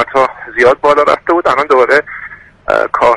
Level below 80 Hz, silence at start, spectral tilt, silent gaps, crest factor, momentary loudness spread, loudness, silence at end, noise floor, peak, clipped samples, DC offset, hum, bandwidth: -44 dBFS; 0 s; -4.5 dB/octave; none; 12 dB; 17 LU; -11 LUFS; 0 s; -32 dBFS; 0 dBFS; under 0.1%; under 0.1%; none; 11.5 kHz